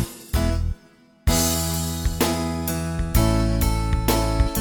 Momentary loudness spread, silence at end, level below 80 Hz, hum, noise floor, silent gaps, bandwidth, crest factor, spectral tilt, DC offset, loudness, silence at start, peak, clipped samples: 7 LU; 0 s; -26 dBFS; none; -53 dBFS; none; 19 kHz; 16 dB; -4.5 dB/octave; under 0.1%; -23 LUFS; 0 s; -6 dBFS; under 0.1%